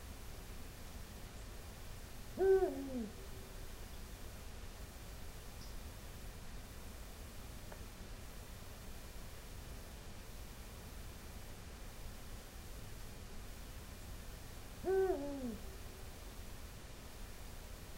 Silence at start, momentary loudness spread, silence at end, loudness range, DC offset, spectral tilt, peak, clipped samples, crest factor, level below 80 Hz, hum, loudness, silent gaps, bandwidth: 0 s; 14 LU; 0 s; 12 LU; under 0.1%; -5 dB/octave; -22 dBFS; under 0.1%; 22 dB; -52 dBFS; none; -46 LUFS; none; 16 kHz